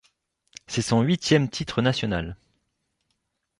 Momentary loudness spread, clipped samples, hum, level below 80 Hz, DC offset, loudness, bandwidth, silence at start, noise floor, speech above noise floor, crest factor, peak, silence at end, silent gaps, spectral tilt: 10 LU; under 0.1%; none; -50 dBFS; under 0.1%; -24 LUFS; 11.5 kHz; 0.7 s; -76 dBFS; 53 dB; 20 dB; -6 dBFS; 1.25 s; none; -5.5 dB/octave